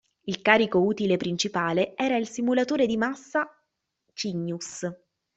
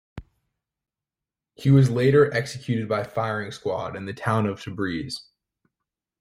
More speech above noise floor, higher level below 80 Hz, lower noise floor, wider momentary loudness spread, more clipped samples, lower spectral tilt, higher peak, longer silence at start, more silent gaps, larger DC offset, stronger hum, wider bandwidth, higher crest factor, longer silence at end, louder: second, 52 dB vs 67 dB; second, -66 dBFS vs -56 dBFS; second, -78 dBFS vs -89 dBFS; about the same, 13 LU vs 12 LU; neither; second, -4.5 dB/octave vs -7 dB/octave; about the same, -4 dBFS vs -6 dBFS; about the same, 0.25 s vs 0.15 s; neither; neither; neither; second, 8.2 kHz vs 12 kHz; about the same, 22 dB vs 18 dB; second, 0.4 s vs 1 s; second, -26 LUFS vs -23 LUFS